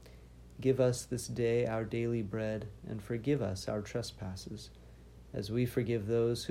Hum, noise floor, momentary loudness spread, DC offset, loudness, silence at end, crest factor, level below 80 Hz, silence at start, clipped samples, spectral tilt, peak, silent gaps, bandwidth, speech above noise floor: none; -54 dBFS; 13 LU; under 0.1%; -35 LUFS; 0 s; 18 dB; -56 dBFS; 0 s; under 0.1%; -6 dB/octave; -16 dBFS; none; 16 kHz; 20 dB